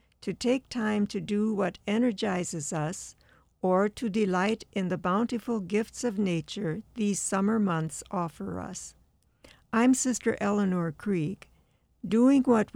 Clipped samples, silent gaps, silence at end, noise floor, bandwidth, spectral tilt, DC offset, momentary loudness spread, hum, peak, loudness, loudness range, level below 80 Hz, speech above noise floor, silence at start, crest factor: under 0.1%; none; 0.1 s; -66 dBFS; 15.5 kHz; -5.5 dB/octave; under 0.1%; 11 LU; none; -10 dBFS; -28 LUFS; 2 LU; -62 dBFS; 38 dB; 0.25 s; 18 dB